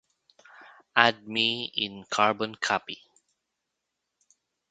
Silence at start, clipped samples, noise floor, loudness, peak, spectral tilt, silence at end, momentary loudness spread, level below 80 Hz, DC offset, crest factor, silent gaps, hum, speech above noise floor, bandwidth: 0.6 s; under 0.1%; -83 dBFS; -26 LUFS; 0 dBFS; -2.5 dB/octave; 1.75 s; 9 LU; -72 dBFS; under 0.1%; 30 dB; none; none; 56 dB; 9.4 kHz